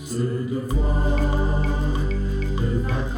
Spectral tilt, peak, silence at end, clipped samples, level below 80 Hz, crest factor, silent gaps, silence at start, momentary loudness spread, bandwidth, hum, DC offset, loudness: -7 dB/octave; -10 dBFS; 0 s; under 0.1%; -22 dBFS; 12 dB; none; 0 s; 4 LU; 11 kHz; none; under 0.1%; -24 LUFS